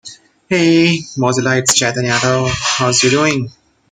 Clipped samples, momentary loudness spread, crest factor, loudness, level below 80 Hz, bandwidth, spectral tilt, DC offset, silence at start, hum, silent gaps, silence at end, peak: under 0.1%; 6 LU; 14 dB; -13 LUFS; -46 dBFS; 16 kHz; -3.5 dB/octave; under 0.1%; 0.05 s; none; none; 0.4 s; 0 dBFS